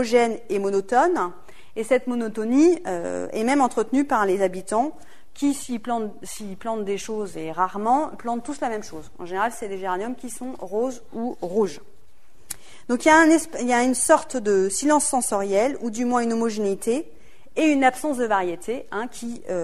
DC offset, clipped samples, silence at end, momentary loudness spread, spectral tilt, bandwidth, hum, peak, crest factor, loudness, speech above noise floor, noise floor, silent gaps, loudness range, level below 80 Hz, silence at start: 1%; under 0.1%; 0 s; 14 LU; -4 dB/octave; 13.5 kHz; none; -2 dBFS; 22 dB; -23 LUFS; 35 dB; -57 dBFS; none; 8 LU; -56 dBFS; 0 s